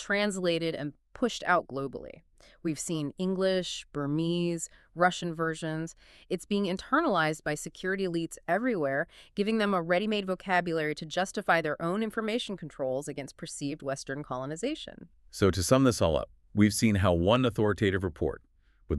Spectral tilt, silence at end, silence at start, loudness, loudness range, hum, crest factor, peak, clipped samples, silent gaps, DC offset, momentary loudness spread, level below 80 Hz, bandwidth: -5 dB/octave; 0 s; 0 s; -30 LUFS; 6 LU; none; 20 dB; -10 dBFS; under 0.1%; none; under 0.1%; 12 LU; -54 dBFS; 13.5 kHz